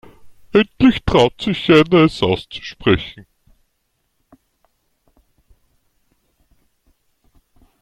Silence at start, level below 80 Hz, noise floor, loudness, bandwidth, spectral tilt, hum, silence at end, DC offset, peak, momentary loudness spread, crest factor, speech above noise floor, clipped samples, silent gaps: 0.25 s; -42 dBFS; -69 dBFS; -15 LUFS; 11.5 kHz; -6.5 dB/octave; none; 4.6 s; under 0.1%; 0 dBFS; 10 LU; 20 dB; 54 dB; under 0.1%; none